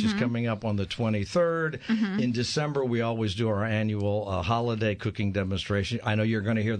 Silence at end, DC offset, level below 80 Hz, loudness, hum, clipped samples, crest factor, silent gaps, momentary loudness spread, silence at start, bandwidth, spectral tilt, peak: 0 s; under 0.1%; -52 dBFS; -28 LUFS; none; under 0.1%; 16 dB; none; 3 LU; 0 s; 10 kHz; -6.5 dB/octave; -10 dBFS